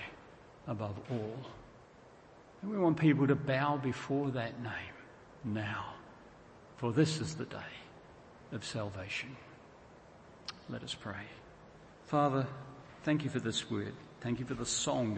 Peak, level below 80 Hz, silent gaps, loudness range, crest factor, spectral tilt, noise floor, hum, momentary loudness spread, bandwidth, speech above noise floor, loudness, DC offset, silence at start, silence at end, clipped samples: -14 dBFS; -66 dBFS; none; 10 LU; 22 dB; -5.5 dB/octave; -58 dBFS; none; 25 LU; 8.4 kHz; 23 dB; -36 LUFS; under 0.1%; 0 s; 0 s; under 0.1%